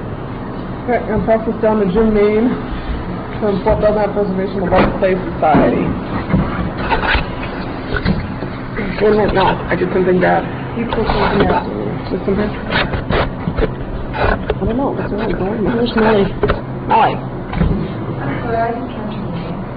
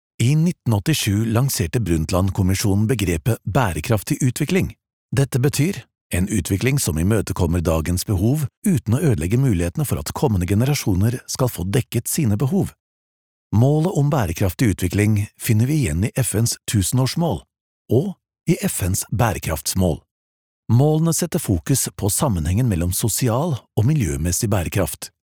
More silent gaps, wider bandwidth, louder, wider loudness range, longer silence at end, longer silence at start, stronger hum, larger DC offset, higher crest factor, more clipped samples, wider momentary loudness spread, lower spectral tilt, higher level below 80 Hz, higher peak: second, none vs 4.93-5.09 s, 6.01-6.10 s, 8.57-8.62 s, 12.80-13.50 s, 17.61-17.85 s, 20.11-20.63 s; second, 5.2 kHz vs over 20 kHz; first, -17 LUFS vs -20 LUFS; about the same, 3 LU vs 2 LU; second, 0 s vs 0.25 s; second, 0 s vs 0.2 s; neither; first, 0.2% vs under 0.1%; about the same, 14 dB vs 18 dB; neither; first, 11 LU vs 4 LU; first, -10.5 dB/octave vs -5.5 dB/octave; first, -28 dBFS vs -38 dBFS; about the same, -2 dBFS vs -2 dBFS